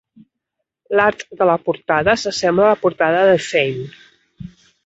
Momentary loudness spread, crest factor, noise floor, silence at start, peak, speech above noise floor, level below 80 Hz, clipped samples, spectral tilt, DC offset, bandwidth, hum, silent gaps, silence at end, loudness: 6 LU; 16 dB; -78 dBFS; 0.9 s; -2 dBFS; 62 dB; -52 dBFS; under 0.1%; -4.5 dB/octave; under 0.1%; 8 kHz; none; none; 0.4 s; -16 LUFS